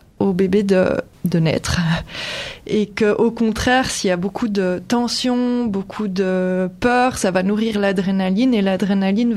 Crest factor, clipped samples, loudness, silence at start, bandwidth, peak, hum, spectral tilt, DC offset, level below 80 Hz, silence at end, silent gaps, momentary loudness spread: 14 dB; under 0.1%; -19 LUFS; 0.2 s; 14 kHz; -4 dBFS; none; -5.5 dB/octave; under 0.1%; -42 dBFS; 0 s; none; 6 LU